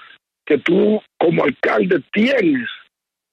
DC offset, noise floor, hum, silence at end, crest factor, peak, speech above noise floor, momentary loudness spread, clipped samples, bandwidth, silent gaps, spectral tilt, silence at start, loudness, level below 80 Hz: under 0.1%; -62 dBFS; none; 0.55 s; 14 dB; -4 dBFS; 46 dB; 6 LU; under 0.1%; 7.8 kHz; none; -7.5 dB/octave; 0.45 s; -17 LUFS; -62 dBFS